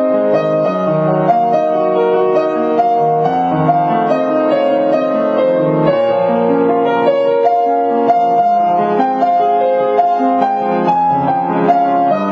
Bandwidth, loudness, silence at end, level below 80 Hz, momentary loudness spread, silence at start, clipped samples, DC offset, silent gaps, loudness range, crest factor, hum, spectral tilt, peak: 6.4 kHz; -13 LUFS; 0 s; -60 dBFS; 2 LU; 0 s; under 0.1%; under 0.1%; none; 1 LU; 12 dB; none; -8.5 dB/octave; -2 dBFS